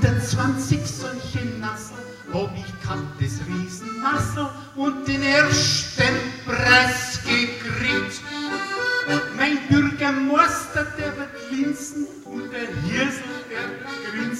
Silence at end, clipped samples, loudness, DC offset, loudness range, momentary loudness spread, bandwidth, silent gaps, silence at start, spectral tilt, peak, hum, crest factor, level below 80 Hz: 0 s; under 0.1%; -22 LUFS; under 0.1%; 8 LU; 13 LU; 15.5 kHz; none; 0 s; -4 dB/octave; -2 dBFS; none; 20 dB; -46 dBFS